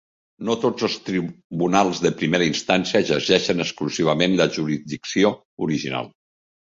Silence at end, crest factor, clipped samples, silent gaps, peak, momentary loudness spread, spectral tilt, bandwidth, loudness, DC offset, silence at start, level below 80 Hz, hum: 0.55 s; 20 dB; under 0.1%; 1.44-1.50 s, 5.45-5.57 s; -2 dBFS; 9 LU; -4.5 dB/octave; 7.8 kHz; -21 LUFS; under 0.1%; 0.4 s; -58 dBFS; none